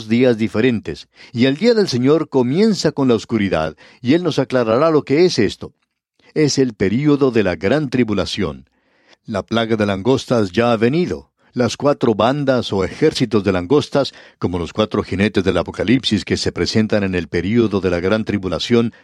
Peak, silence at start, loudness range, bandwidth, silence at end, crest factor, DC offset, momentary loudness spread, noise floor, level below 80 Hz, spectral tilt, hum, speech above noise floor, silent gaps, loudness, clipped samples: -2 dBFS; 0 s; 2 LU; 11.5 kHz; 0.15 s; 16 dB; under 0.1%; 9 LU; -55 dBFS; -46 dBFS; -6 dB/octave; none; 39 dB; none; -17 LUFS; under 0.1%